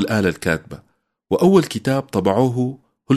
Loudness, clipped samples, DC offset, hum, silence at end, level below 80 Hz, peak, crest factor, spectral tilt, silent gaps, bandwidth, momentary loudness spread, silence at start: -19 LUFS; under 0.1%; under 0.1%; none; 0 s; -50 dBFS; -2 dBFS; 16 dB; -6.5 dB/octave; none; 13.5 kHz; 10 LU; 0 s